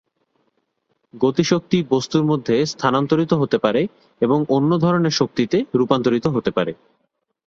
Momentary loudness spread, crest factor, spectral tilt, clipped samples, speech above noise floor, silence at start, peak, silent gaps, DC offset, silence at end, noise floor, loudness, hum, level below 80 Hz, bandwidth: 5 LU; 18 dB; -6 dB/octave; under 0.1%; 51 dB; 1.15 s; -2 dBFS; none; under 0.1%; 0.75 s; -70 dBFS; -19 LUFS; none; -56 dBFS; 7.6 kHz